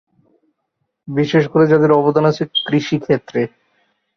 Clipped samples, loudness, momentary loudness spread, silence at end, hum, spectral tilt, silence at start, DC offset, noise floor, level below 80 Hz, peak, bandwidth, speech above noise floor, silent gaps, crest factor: under 0.1%; -16 LUFS; 10 LU; 0.7 s; none; -7 dB/octave; 1.05 s; under 0.1%; -72 dBFS; -56 dBFS; -2 dBFS; 6.6 kHz; 58 dB; none; 16 dB